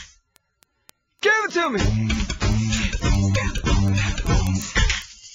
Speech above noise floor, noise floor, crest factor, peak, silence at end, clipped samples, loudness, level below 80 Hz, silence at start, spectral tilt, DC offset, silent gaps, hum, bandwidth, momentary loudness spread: 43 dB; -64 dBFS; 16 dB; -6 dBFS; 0 s; under 0.1%; -22 LUFS; -26 dBFS; 0 s; -4.5 dB/octave; under 0.1%; none; none; 15.5 kHz; 4 LU